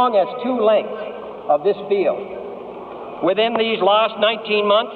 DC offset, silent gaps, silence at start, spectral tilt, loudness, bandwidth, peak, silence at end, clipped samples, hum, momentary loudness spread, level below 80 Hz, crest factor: under 0.1%; none; 0 s; -7.5 dB/octave; -18 LUFS; 4.6 kHz; -4 dBFS; 0 s; under 0.1%; none; 16 LU; -64 dBFS; 14 dB